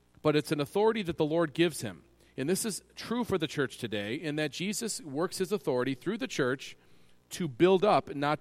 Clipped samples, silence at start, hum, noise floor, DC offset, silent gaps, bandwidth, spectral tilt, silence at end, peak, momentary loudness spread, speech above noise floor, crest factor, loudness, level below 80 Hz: under 0.1%; 0.25 s; none; -58 dBFS; under 0.1%; none; 16 kHz; -5 dB/octave; 0.05 s; -12 dBFS; 11 LU; 28 dB; 18 dB; -30 LUFS; -64 dBFS